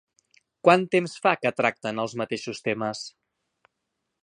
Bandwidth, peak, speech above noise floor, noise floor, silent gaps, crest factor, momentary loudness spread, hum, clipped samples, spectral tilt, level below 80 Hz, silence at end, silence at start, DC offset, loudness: 10.5 kHz; -2 dBFS; 56 dB; -81 dBFS; none; 24 dB; 11 LU; none; under 0.1%; -5 dB/octave; -72 dBFS; 1.15 s; 0.65 s; under 0.1%; -25 LUFS